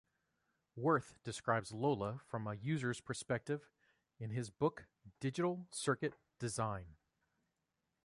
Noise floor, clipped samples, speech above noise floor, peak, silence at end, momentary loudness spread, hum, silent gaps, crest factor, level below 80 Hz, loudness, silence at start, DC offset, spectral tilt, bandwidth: -87 dBFS; under 0.1%; 48 dB; -20 dBFS; 1.1 s; 10 LU; none; none; 22 dB; -70 dBFS; -40 LUFS; 0.75 s; under 0.1%; -5.5 dB/octave; 11.5 kHz